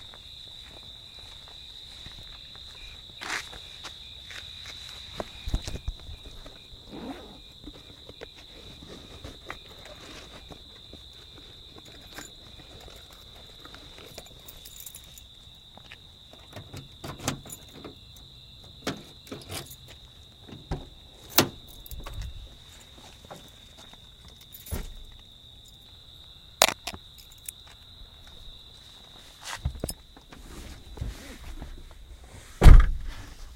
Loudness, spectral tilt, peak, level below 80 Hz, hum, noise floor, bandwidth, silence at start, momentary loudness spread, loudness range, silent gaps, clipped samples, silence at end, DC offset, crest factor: -31 LUFS; -4 dB/octave; 0 dBFS; -32 dBFS; none; -50 dBFS; 16.5 kHz; 0.9 s; 14 LU; 13 LU; none; under 0.1%; 0.1 s; under 0.1%; 30 dB